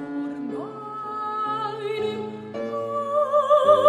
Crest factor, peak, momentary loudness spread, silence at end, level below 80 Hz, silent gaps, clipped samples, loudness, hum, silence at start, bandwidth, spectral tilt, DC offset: 18 dB; -4 dBFS; 14 LU; 0 s; -70 dBFS; none; under 0.1%; -25 LUFS; none; 0 s; 10.5 kHz; -6 dB/octave; under 0.1%